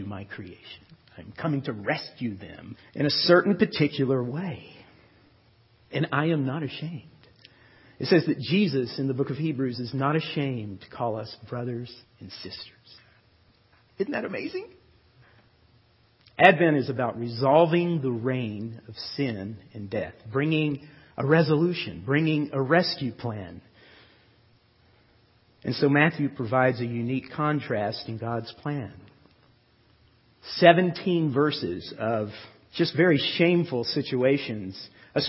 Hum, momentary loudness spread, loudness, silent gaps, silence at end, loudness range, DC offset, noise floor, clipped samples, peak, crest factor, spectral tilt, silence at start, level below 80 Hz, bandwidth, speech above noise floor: none; 19 LU; -25 LUFS; none; 0 s; 11 LU; under 0.1%; -61 dBFS; under 0.1%; 0 dBFS; 26 dB; -9 dB/octave; 0 s; -62 dBFS; 5.8 kHz; 36 dB